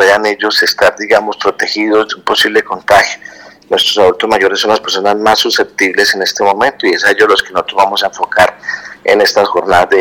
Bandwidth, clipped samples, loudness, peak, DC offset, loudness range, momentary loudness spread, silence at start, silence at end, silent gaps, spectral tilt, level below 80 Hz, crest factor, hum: over 20 kHz; 0.2%; -10 LUFS; 0 dBFS; under 0.1%; 1 LU; 5 LU; 0 s; 0 s; none; -2 dB/octave; -48 dBFS; 10 dB; none